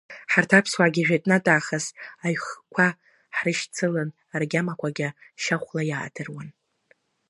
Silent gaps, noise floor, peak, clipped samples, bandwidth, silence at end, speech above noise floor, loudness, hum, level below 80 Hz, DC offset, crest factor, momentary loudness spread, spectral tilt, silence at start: none; -64 dBFS; -2 dBFS; under 0.1%; 11.5 kHz; 0.8 s; 40 dB; -24 LUFS; none; -72 dBFS; under 0.1%; 24 dB; 12 LU; -5 dB/octave; 0.1 s